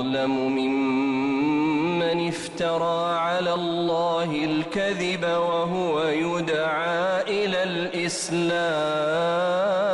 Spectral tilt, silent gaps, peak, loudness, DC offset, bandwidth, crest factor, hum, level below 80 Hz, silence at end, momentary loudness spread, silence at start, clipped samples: -5 dB/octave; none; -14 dBFS; -24 LUFS; under 0.1%; 11.5 kHz; 10 dB; none; -62 dBFS; 0 s; 2 LU; 0 s; under 0.1%